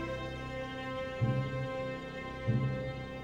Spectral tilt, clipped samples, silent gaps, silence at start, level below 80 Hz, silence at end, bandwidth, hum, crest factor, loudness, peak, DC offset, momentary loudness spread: -7.5 dB/octave; under 0.1%; none; 0 s; -52 dBFS; 0 s; 7.8 kHz; none; 16 dB; -36 LUFS; -20 dBFS; under 0.1%; 7 LU